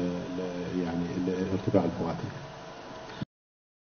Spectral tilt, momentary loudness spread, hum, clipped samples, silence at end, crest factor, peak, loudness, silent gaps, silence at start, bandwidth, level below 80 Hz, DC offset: -6.5 dB/octave; 16 LU; none; under 0.1%; 0.65 s; 22 dB; -10 dBFS; -32 LUFS; none; 0 s; 6.6 kHz; -58 dBFS; under 0.1%